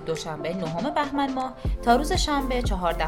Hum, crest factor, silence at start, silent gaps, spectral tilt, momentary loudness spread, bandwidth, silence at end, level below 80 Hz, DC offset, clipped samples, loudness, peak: none; 18 dB; 0 s; none; -5 dB/octave; 8 LU; 17 kHz; 0 s; -32 dBFS; under 0.1%; under 0.1%; -26 LUFS; -8 dBFS